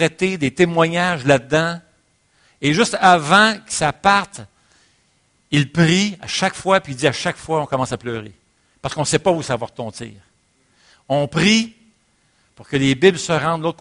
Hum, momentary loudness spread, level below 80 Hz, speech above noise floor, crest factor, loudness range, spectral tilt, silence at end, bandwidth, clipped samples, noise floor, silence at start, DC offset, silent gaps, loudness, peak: none; 15 LU; -52 dBFS; 44 dB; 20 dB; 6 LU; -4.5 dB/octave; 0.05 s; 10.5 kHz; under 0.1%; -61 dBFS; 0 s; under 0.1%; none; -17 LUFS; 0 dBFS